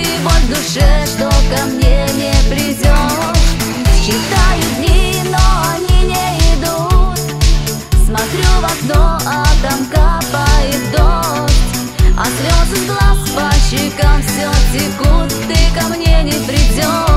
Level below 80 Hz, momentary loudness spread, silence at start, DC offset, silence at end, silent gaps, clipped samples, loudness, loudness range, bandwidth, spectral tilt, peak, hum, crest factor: -12 dBFS; 2 LU; 0 s; under 0.1%; 0 s; none; under 0.1%; -13 LUFS; 1 LU; 16 kHz; -4.5 dB/octave; 0 dBFS; none; 10 dB